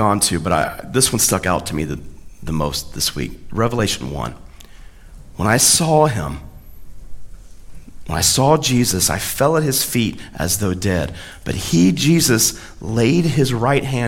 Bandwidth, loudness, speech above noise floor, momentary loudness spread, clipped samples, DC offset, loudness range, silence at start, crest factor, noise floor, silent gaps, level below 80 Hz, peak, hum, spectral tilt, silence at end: 17 kHz; -17 LUFS; 21 dB; 14 LU; under 0.1%; under 0.1%; 5 LU; 0 s; 18 dB; -38 dBFS; none; -38 dBFS; 0 dBFS; none; -4 dB/octave; 0 s